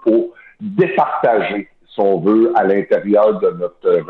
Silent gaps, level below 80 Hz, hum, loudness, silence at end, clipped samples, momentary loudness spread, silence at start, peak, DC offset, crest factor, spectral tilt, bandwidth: none; -62 dBFS; none; -15 LUFS; 0.05 s; under 0.1%; 12 LU; 0.05 s; -2 dBFS; under 0.1%; 12 dB; -9.5 dB/octave; 4.3 kHz